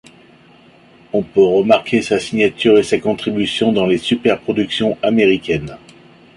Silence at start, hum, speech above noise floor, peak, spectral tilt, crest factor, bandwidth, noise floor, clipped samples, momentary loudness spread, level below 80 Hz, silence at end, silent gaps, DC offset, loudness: 1.15 s; none; 31 dB; 0 dBFS; -5.5 dB/octave; 16 dB; 11.5 kHz; -46 dBFS; under 0.1%; 7 LU; -50 dBFS; 0.6 s; none; under 0.1%; -15 LUFS